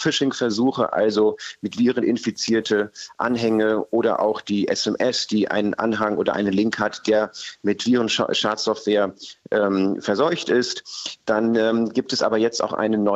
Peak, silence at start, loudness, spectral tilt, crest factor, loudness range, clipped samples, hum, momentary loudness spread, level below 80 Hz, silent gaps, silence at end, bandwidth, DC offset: -8 dBFS; 0 s; -21 LUFS; -4.5 dB/octave; 14 dB; 1 LU; under 0.1%; none; 6 LU; -64 dBFS; none; 0 s; 8.2 kHz; under 0.1%